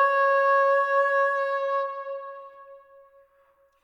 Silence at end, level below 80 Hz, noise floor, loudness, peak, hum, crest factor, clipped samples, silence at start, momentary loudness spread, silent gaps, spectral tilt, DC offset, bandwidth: 1.05 s; -82 dBFS; -63 dBFS; -23 LUFS; -10 dBFS; none; 14 dB; under 0.1%; 0 s; 17 LU; none; 0.5 dB/octave; under 0.1%; 7 kHz